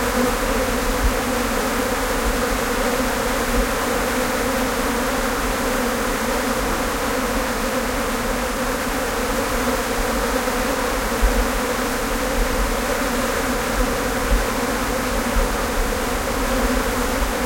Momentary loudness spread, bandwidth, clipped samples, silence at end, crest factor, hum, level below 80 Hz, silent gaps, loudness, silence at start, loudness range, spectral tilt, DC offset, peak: 2 LU; 16.5 kHz; under 0.1%; 0 s; 16 dB; none; -28 dBFS; none; -21 LUFS; 0 s; 1 LU; -3.5 dB/octave; under 0.1%; -4 dBFS